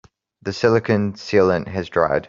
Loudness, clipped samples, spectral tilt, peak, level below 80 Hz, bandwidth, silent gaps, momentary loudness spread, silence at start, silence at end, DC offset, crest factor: -19 LUFS; under 0.1%; -6.5 dB/octave; -2 dBFS; -52 dBFS; 7.6 kHz; none; 8 LU; 0.45 s; 0 s; under 0.1%; 18 dB